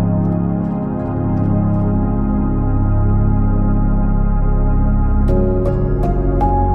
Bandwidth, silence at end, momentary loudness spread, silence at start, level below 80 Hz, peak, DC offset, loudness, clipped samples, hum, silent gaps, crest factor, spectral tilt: 2.6 kHz; 0 s; 3 LU; 0 s; -18 dBFS; -4 dBFS; under 0.1%; -17 LUFS; under 0.1%; none; none; 10 dB; -12 dB/octave